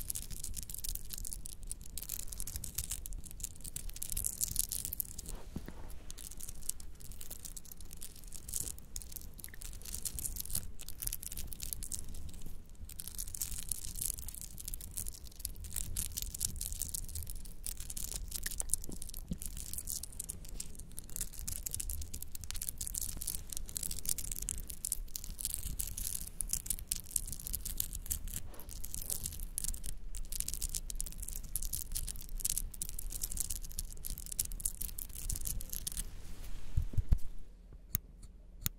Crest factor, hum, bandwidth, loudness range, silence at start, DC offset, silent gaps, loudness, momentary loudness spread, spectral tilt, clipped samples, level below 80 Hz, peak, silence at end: 34 dB; none; 17 kHz; 4 LU; 0 s; under 0.1%; none; -40 LUFS; 11 LU; -2 dB/octave; under 0.1%; -44 dBFS; -6 dBFS; 0 s